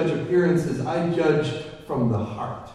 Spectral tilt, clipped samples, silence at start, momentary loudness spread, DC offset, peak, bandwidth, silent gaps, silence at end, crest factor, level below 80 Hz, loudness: -7.5 dB/octave; under 0.1%; 0 s; 10 LU; under 0.1%; -8 dBFS; 12 kHz; none; 0 s; 16 dB; -52 dBFS; -24 LUFS